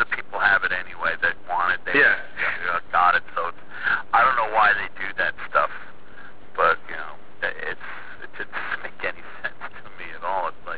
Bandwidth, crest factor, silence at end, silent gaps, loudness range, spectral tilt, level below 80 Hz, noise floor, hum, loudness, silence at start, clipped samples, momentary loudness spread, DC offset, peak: 4 kHz; 18 dB; 0 s; none; 10 LU; -6 dB/octave; -56 dBFS; -46 dBFS; none; -22 LUFS; 0 s; under 0.1%; 17 LU; 3%; -6 dBFS